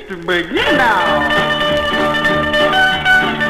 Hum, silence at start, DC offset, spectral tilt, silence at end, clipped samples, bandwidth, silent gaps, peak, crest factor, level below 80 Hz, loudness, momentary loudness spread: none; 0 s; 0.2%; -4 dB/octave; 0 s; under 0.1%; 16 kHz; none; -2 dBFS; 12 dB; -36 dBFS; -13 LUFS; 3 LU